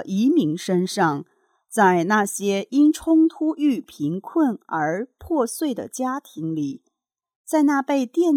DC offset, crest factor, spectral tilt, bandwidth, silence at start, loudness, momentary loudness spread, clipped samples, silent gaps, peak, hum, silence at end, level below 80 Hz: under 0.1%; 16 dB; -5.5 dB/octave; 15.5 kHz; 0 s; -22 LUFS; 10 LU; under 0.1%; 7.36-7.45 s; -6 dBFS; none; 0 s; -60 dBFS